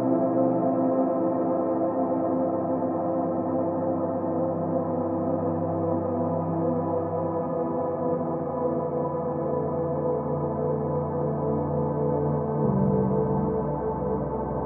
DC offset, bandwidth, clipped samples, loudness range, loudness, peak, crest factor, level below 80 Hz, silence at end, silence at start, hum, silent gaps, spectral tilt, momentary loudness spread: under 0.1%; 2.7 kHz; under 0.1%; 2 LU; -26 LUFS; -12 dBFS; 14 dB; -52 dBFS; 0 s; 0 s; none; none; -14.5 dB/octave; 4 LU